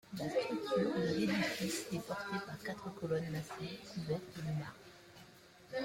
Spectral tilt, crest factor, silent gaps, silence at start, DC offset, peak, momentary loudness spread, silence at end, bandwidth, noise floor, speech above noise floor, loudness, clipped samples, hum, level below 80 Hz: -5 dB/octave; 16 dB; none; 0.05 s; under 0.1%; -22 dBFS; 20 LU; 0 s; 16.5 kHz; -60 dBFS; 21 dB; -39 LUFS; under 0.1%; none; -70 dBFS